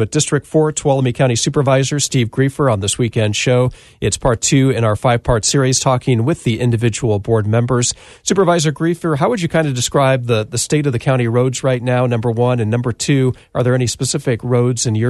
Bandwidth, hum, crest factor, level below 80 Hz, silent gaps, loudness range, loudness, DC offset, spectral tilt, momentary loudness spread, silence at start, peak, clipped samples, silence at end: 12.5 kHz; none; 12 dB; -40 dBFS; none; 1 LU; -16 LUFS; under 0.1%; -5 dB/octave; 4 LU; 0 s; -2 dBFS; under 0.1%; 0 s